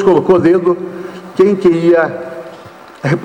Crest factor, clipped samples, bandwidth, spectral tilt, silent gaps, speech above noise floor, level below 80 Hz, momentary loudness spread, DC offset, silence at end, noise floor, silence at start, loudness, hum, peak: 10 dB; under 0.1%; 9 kHz; -8 dB/octave; none; 25 dB; -50 dBFS; 18 LU; under 0.1%; 0 s; -35 dBFS; 0 s; -12 LUFS; none; -2 dBFS